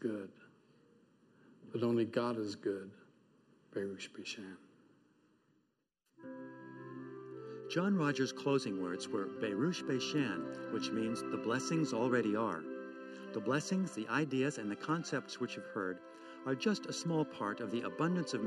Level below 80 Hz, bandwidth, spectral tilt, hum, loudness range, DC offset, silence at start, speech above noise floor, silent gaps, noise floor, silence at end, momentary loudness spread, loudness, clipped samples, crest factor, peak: -84 dBFS; 12.5 kHz; -5.5 dB/octave; none; 13 LU; under 0.1%; 0 s; 45 dB; none; -82 dBFS; 0 s; 15 LU; -37 LUFS; under 0.1%; 18 dB; -20 dBFS